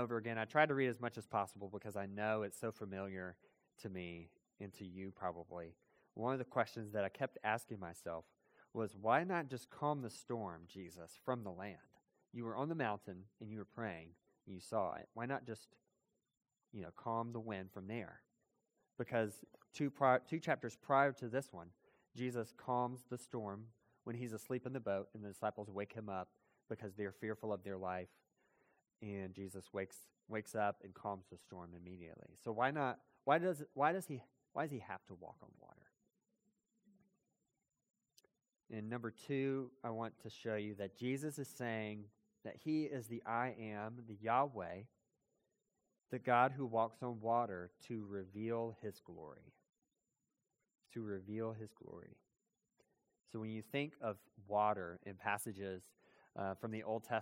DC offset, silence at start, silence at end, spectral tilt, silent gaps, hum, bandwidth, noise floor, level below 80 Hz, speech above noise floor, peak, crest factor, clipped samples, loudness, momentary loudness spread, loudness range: under 0.1%; 0 s; 0 s; -6 dB/octave; none; none; 16.5 kHz; -90 dBFS; -82 dBFS; 47 dB; -16 dBFS; 26 dB; under 0.1%; -42 LUFS; 18 LU; 9 LU